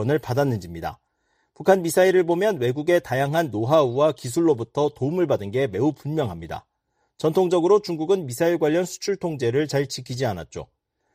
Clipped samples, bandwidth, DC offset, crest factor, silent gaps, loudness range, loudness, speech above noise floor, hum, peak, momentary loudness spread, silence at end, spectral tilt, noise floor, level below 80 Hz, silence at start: under 0.1%; 15.5 kHz; under 0.1%; 18 dB; none; 4 LU; -22 LUFS; 51 dB; none; -4 dBFS; 11 LU; 0.5 s; -6 dB/octave; -72 dBFS; -56 dBFS; 0 s